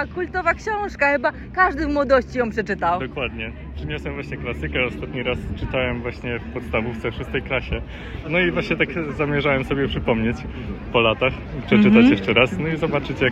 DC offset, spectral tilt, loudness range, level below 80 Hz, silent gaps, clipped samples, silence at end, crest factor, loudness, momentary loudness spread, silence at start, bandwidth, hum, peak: under 0.1%; -7 dB/octave; 7 LU; -36 dBFS; none; under 0.1%; 0 s; 20 dB; -21 LUFS; 12 LU; 0 s; 8.2 kHz; none; 0 dBFS